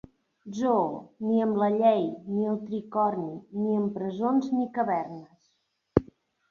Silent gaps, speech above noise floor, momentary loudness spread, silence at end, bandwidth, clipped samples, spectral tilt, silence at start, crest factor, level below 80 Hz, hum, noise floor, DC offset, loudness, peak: none; 48 dB; 10 LU; 0.45 s; 7 kHz; under 0.1%; -8.5 dB/octave; 0.45 s; 24 dB; -56 dBFS; none; -74 dBFS; under 0.1%; -27 LUFS; -4 dBFS